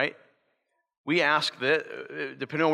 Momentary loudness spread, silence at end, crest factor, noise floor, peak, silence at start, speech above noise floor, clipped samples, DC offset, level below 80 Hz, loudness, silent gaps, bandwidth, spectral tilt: 13 LU; 0 s; 18 dB; -76 dBFS; -10 dBFS; 0 s; 50 dB; under 0.1%; under 0.1%; -84 dBFS; -27 LUFS; 0.98-1.04 s; 12.5 kHz; -4.5 dB/octave